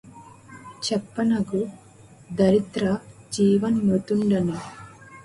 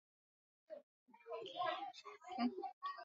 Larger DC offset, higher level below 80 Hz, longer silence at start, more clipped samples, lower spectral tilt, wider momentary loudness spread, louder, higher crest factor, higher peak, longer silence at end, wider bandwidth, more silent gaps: neither; first, -56 dBFS vs under -90 dBFS; second, 0.05 s vs 0.7 s; neither; first, -6.5 dB/octave vs -1.5 dB/octave; first, 19 LU vs 16 LU; first, -23 LUFS vs -46 LUFS; about the same, 18 dB vs 20 dB; first, -8 dBFS vs -26 dBFS; about the same, 0 s vs 0 s; first, 11.5 kHz vs 7.4 kHz; second, none vs 0.83-1.06 s, 2.73-2.81 s